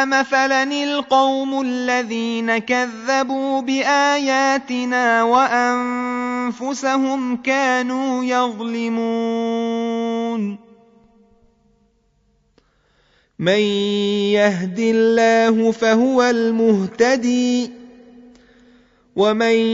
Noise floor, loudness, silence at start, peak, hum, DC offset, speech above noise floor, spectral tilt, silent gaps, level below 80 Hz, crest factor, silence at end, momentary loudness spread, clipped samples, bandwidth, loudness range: -61 dBFS; -18 LUFS; 0 s; -2 dBFS; none; under 0.1%; 44 dB; -4.5 dB/octave; none; -64 dBFS; 16 dB; 0 s; 7 LU; under 0.1%; 7.8 kHz; 9 LU